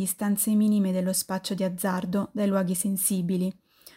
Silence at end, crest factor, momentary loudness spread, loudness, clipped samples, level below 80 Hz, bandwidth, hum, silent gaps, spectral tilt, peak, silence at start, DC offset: 0.45 s; 16 dB; 7 LU; -26 LUFS; under 0.1%; -66 dBFS; 16 kHz; none; none; -5 dB/octave; -10 dBFS; 0 s; under 0.1%